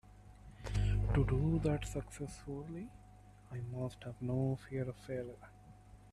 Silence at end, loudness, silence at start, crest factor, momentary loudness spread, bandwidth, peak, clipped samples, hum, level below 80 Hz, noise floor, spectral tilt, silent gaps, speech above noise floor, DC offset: 0 s; -39 LUFS; 0.1 s; 18 dB; 22 LU; 13 kHz; -20 dBFS; under 0.1%; 50 Hz at -50 dBFS; -46 dBFS; -59 dBFS; -7.5 dB/octave; none; 21 dB; under 0.1%